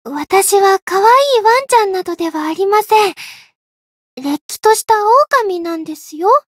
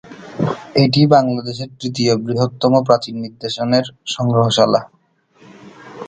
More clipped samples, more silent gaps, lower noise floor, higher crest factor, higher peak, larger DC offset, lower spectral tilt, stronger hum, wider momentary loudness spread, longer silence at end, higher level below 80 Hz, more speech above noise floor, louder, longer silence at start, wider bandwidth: neither; first, 0.82-0.87 s, 3.55-4.17 s, 4.41-4.49 s vs none; first, under -90 dBFS vs -54 dBFS; about the same, 14 dB vs 16 dB; about the same, 0 dBFS vs 0 dBFS; neither; second, -1.5 dB/octave vs -6 dB/octave; neither; about the same, 12 LU vs 12 LU; first, 0.2 s vs 0 s; second, -64 dBFS vs -56 dBFS; first, over 77 dB vs 38 dB; first, -13 LUFS vs -16 LUFS; about the same, 0.05 s vs 0.05 s; first, 16.5 kHz vs 9.4 kHz